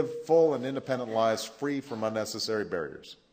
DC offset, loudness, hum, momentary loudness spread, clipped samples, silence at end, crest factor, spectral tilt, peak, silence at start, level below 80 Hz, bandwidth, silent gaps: under 0.1%; -29 LUFS; none; 10 LU; under 0.1%; 0.2 s; 16 dB; -4.5 dB/octave; -12 dBFS; 0 s; -74 dBFS; 16 kHz; none